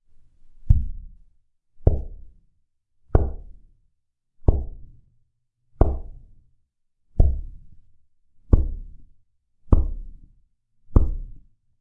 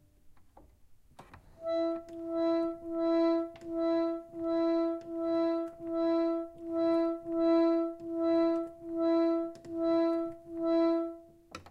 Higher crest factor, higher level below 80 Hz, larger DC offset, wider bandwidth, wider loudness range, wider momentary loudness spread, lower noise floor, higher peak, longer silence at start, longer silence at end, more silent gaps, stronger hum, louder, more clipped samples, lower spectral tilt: first, 22 dB vs 14 dB; first, -26 dBFS vs -66 dBFS; neither; second, 1.7 kHz vs 5.6 kHz; about the same, 3 LU vs 3 LU; first, 20 LU vs 10 LU; first, -72 dBFS vs -58 dBFS; first, -2 dBFS vs -18 dBFS; first, 0.65 s vs 0.25 s; first, 0.45 s vs 0.1 s; neither; neither; first, -25 LUFS vs -31 LUFS; neither; first, -12 dB/octave vs -7 dB/octave